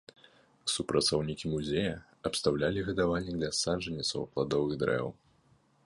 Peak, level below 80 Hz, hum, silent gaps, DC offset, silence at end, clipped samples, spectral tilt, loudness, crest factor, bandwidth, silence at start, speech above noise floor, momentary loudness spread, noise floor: -12 dBFS; -54 dBFS; none; none; under 0.1%; 0.7 s; under 0.1%; -4.5 dB/octave; -32 LUFS; 20 dB; 11.5 kHz; 0.65 s; 35 dB; 6 LU; -67 dBFS